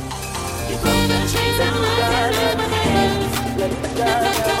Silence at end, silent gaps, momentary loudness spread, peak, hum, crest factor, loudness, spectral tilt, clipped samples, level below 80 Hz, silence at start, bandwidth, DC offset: 0 s; none; 7 LU; -4 dBFS; none; 16 dB; -19 LUFS; -4 dB/octave; under 0.1%; -34 dBFS; 0 s; 17 kHz; under 0.1%